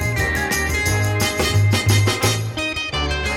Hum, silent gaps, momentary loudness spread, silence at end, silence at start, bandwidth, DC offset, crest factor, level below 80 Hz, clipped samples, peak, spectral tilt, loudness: none; none; 5 LU; 0 s; 0 s; 16.5 kHz; under 0.1%; 14 dB; -30 dBFS; under 0.1%; -4 dBFS; -4 dB/octave; -19 LUFS